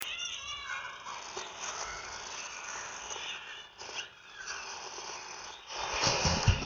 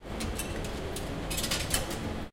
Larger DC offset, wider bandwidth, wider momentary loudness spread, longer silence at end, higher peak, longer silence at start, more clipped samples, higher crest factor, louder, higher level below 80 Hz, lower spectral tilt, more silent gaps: neither; first, over 20 kHz vs 17 kHz; first, 14 LU vs 7 LU; about the same, 0 s vs 0 s; first, -8 dBFS vs -12 dBFS; about the same, 0 s vs 0 s; neither; first, 30 dB vs 22 dB; second, -36 LUFS vs -33 LUFS; second, -46 dBFS vs -40 dBFS; about the same, -2.5 dB/octave vs -3.5 dB/octave; neither